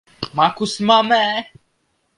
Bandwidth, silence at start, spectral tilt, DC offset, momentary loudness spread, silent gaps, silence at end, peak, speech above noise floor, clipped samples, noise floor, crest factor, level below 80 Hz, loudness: 11.5 kHz; 0.2 s; -4 dB/octave; under 0.1%; 11 LU; none; 0.75 s; 0 dBFS; 50 dB; under 0.1%; -67 dBFS; 18 dB; -60 dBFS; -17 LUFS